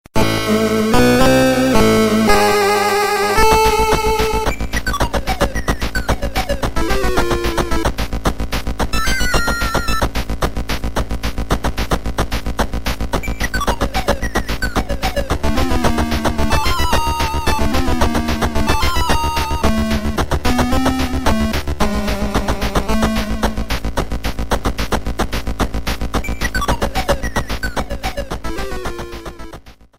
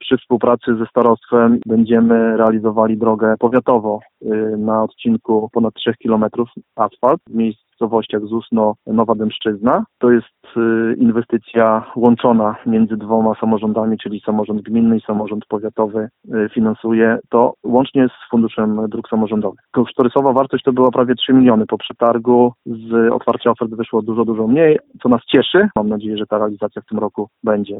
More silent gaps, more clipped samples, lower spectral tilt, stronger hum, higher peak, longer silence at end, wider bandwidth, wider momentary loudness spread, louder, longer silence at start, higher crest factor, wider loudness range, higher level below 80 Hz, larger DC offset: neither; neither; second, -4.5 dB/octave vs -9.5 dB/octave; neither; about the same, 0 dBFS vs 0 dBFS; first, 0.25 s vs 0 s; first, 16.5 kHz vs 4 kHz; about the same, 10 LU vs 8 LU; about the same, -18 LUFS vs -16 LUFS; first, 0.15 s vs 0 s; about the same, 16 dB vs 14 dB; first, 8 LU vs 4 LU; first, -22 dBFS vs -54 dBFS; neither